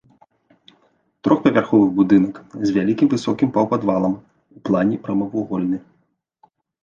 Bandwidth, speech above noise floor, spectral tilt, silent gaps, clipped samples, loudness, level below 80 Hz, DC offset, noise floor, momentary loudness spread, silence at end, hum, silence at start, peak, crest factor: 7.4 kHz; 48 dB; -8 dB/octave; none; under 0.1%; -19 LUFS; -56 dBFS; under 0.1%; -66 dBFS; 9 LU; 1.05 s; none; 1.25 s; -2 dBFS; 18 dB